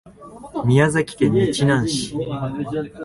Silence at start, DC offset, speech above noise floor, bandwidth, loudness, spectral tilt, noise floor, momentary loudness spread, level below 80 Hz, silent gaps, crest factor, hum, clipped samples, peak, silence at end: 0.05 s; under 0.1%; 21 dB; 11.5 kHz; -20 LUFS; -6 dB/octave; -40 dBFS; 10 LU; -48 dBFS; none; 18 dB; none; under 0.1%; -2 dBFS; 0 s